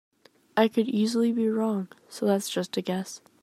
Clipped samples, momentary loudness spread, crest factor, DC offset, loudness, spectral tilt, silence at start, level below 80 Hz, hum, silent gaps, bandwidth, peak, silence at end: under 0.1%; 9 LU; 20 dB; under 0.1%; -27 LUFS; -5.5 dB/octave; 0.55 s; -78 dBFS; none; none; 14.5 kHz; -8 dBFS; 0.25 s